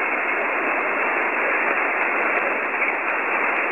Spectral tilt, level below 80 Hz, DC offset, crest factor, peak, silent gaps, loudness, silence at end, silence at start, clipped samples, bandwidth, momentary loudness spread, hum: -5 dB/octave; -70 dBFS; 0.2%; 14 dB; -8 dBFS; none; -20 LUFS; 0 s; 0 s; under 0.1%; 16 kHz; 2 LU; none